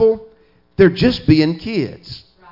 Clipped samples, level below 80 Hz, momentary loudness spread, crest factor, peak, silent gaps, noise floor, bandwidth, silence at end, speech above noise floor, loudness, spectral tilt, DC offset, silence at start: under 0.1%; -40 dBFS; 21 LU; 16 dB; 0 dBFS; none; -52 dBFS; 5.8 kHz; 0.35 s; 37 dB; -16 LUFS; -8 dB/octave; under 0.1%; 0 s